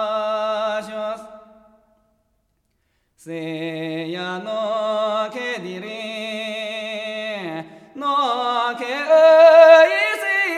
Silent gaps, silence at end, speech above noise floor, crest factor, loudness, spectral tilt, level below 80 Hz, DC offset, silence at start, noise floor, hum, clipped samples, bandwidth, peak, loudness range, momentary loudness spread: none; 0 s; 41 dB; 18 dB; -18 LUFS; -4 dB/octave; -70 dBFS; under 0.1%; 0 s; -68 dBFS; none; under 0.1%; 13 kHz; 0 dBFS; 17 LU; 19 LU